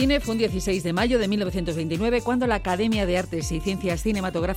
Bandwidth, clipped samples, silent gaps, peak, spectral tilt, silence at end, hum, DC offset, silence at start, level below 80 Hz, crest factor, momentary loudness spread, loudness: 16.5 kHz; under 0.1%; none; -10 dBFS; -5.5 dB/octave; 0 s; none; under 0.1%; 0 s; -36 dBFS; 14 dB; 5 LU; -24 LUFS